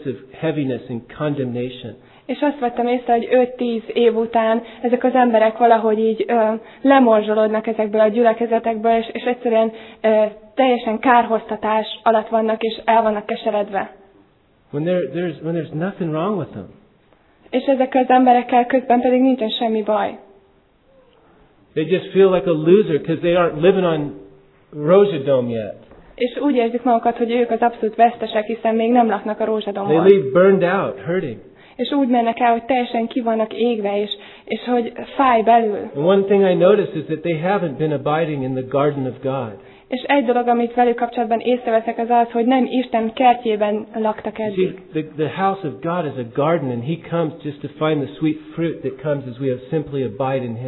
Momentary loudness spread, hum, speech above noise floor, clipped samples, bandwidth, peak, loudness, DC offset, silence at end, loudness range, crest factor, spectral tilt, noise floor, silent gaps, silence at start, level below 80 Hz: 11 LU; none; 38 dB; under 0.1%; 4.3 kHz; 0 dBFS; -18 LUFS; under 0.1%; 0 s; 6 LU; 18 dB; -10.5 dB/octave; -55 dBFS; none; 0 s; -58 dBFS